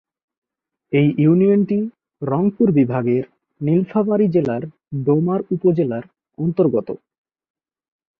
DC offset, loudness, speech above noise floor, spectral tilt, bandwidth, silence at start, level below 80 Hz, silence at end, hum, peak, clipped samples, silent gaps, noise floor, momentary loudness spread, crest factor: under 0.1%; -18 LUFS; 60 dB; -11.5 dB/octave; 4.7 kHz; 0.9 s; -60 dBFS; 1.25 s; none; -4 dBFS; under 0.1%; none; -78 dBFS; 14 LU; 14 dB